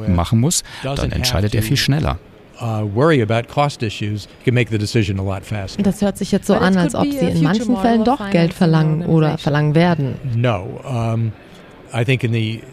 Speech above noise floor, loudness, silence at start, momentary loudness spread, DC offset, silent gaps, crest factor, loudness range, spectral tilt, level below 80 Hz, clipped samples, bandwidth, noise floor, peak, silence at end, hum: 23 dB; -18 LUFS; 0 s; 9 LU; under 0.1%; none; 16 dB; 3 LU; -6 dB/octave; -36 dBFS; under 0.1%; 15 kHz; -40 dBFS; 0 dBFS; 0 s; none